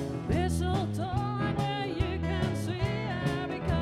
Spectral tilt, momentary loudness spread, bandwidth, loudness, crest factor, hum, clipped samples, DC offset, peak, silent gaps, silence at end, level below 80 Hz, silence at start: -6.5 dB/octave; 2 LU; 14 kHz; -31 LUFS; 14 dB; none; under 0.1%; under 0.1%; -16 dBFS; none; 0 s; -40 dBFS; 0 s